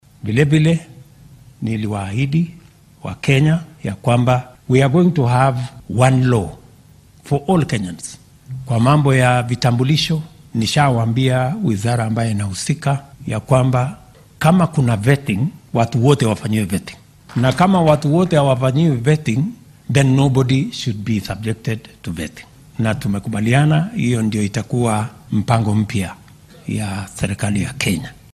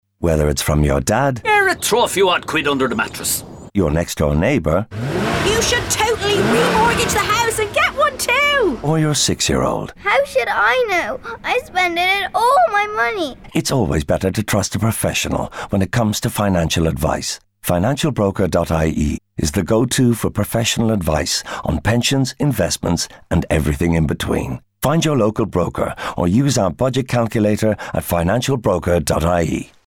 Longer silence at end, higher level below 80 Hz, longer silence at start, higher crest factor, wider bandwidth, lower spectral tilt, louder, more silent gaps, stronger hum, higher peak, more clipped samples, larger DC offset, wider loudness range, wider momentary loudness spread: about the same, 0.2 s vs 0.2 s; second, -44 dBFS vs -32 dBFS; about the same, 0.25 s vs 0.2 s; about the same, 16 dB vs 12 dB; second, 13.5 kHz vs 19 kHz; first, -6.5 dB/octave vs -4.5 dB/octave; about the same, -17 LUFS vs -17 LUFS; neither; neither; first, 0 dBFS vs -6 dBFS; neither; neither; about the same, 4 LU vs 3 LU; first, 12 LU vs 6 LU